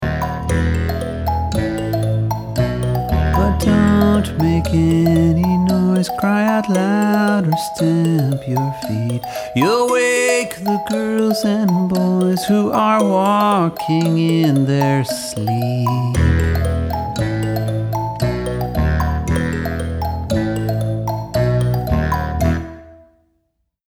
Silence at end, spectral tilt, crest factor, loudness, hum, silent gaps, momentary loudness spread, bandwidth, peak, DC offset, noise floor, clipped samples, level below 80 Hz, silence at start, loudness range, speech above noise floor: 0.95 s; -6.5 dB/octave; 14 dB; -17 LUFS; none; none; 7 LU; over 20 kHz; -2 dBFS; under 0.1%; -69 dBFS; under 0.1%; -28 dBFS; 0 s; 5 LU; 53 dB